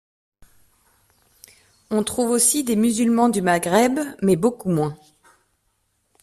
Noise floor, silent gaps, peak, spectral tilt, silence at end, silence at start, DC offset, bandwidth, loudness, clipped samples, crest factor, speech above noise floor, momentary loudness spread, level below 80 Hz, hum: -69 dBFS; none; -4 dBFS; -4.5 dB/octave; 1.25 s; 1.9 s; under 0.1%; 15 kHz; -20 LUFS; under 0.1%; 18 dB; 50 dB; 7 LU; -58 dBFS; none